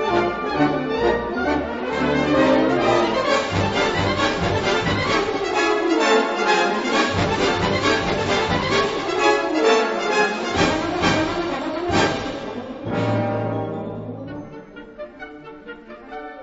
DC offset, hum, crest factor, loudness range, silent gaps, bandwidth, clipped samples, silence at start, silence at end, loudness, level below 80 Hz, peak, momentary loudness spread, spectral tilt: under 0.1%; none; 16 dB; 7 LU; none; 8 kHz; under 0.1%; 0 s; 0 s; -20 LUFS; -42 dBFS; -4 dBFS; 17 LU; -5 dB/octave